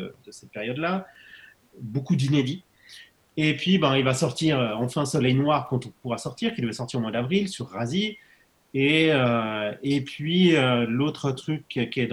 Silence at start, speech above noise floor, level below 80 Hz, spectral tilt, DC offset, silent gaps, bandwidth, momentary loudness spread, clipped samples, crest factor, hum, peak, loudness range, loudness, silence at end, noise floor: 0 s; 26 dB; -60 dBFS; -5.5 dB/octave; under 0.1%; none; 12.5 kHz; 12 LU; under 0.1%; 18 dB; none; -6 dBFS; 5 LU; -24 LUFS; 0 s; -51 dBFS